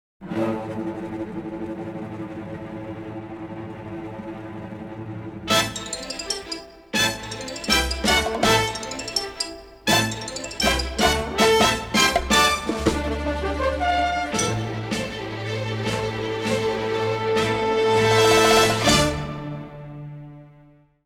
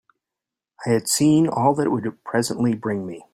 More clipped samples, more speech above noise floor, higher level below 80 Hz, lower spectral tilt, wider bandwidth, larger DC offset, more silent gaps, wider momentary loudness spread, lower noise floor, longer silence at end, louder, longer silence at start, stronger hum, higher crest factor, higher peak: neither; second, 24 dB vs 67 dB; first, -38 dBFS vs -60 dBFS; second, -3.5 dB/octave vs -5 dB/octave; first, 19 kHz vs 15.5 kHz; neither; neither; first, 17 LU vs 10 LU; second, -53 dBFS vs -87 dBFS; first, 0.55 s vs 0.1 s; about the same, -22 LUFS vs -21 LUFS; second, 0.2 s vs 0.8 s; neither; about the same, 20 dB vs 16 dB; about the same, -4 dBFS vs -4 dBFS